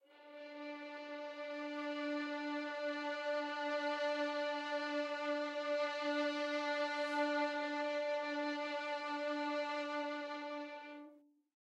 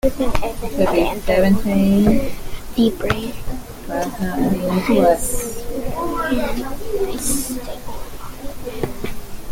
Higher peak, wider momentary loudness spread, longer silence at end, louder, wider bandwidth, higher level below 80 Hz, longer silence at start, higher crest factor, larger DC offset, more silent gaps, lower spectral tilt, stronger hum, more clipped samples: second, -24 dBFS vs 0 dBFS; second, 10 LU vs 17 LU; first, 0.5 s vs 0 s; second, -40 LUFS vs -20 LUFS; second, 9.4 kHz vs 17 kHz; second, under -90 dBFS vs -30 dBFS; about the same, 0.1 s vs 0.05 s; about the same, 16 dB vs 18 dB; neither; neither; second, -1.5 dB/octave vs -5.5 dB/octave; neither; neither